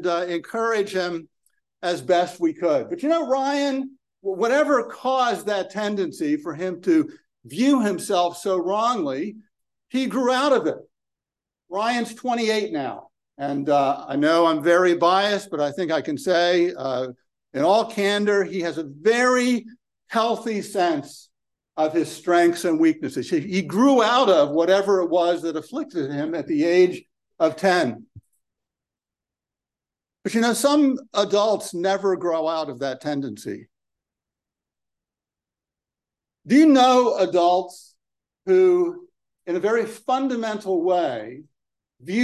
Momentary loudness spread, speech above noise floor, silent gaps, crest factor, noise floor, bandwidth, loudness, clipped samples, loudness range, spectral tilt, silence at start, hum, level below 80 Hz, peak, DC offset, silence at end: 11 LU; 69 dB; none; 18 dB; -90 dBFS; 12.5 kHz; -21 LUFS; under 0.1%; 6 LU; -4.5 dB/octave; 0 s; none; -74 dBFS; -4 dBFS; under 0.1%; 0 s